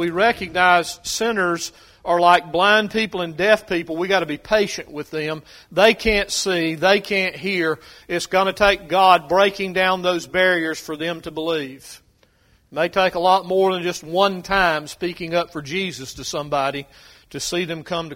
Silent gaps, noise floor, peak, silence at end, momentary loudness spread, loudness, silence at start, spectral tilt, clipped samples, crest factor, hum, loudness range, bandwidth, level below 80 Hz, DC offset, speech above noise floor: none; -58 dBFS; 0 dBFS; 0 s; 12 LU; -19 LUFS; 0 s; -3.5 dB/octave; under 0.1%; 20 dB; none; 5 LU; 16.5 kHz; -46 dBFS; under 0.1%; 38 dB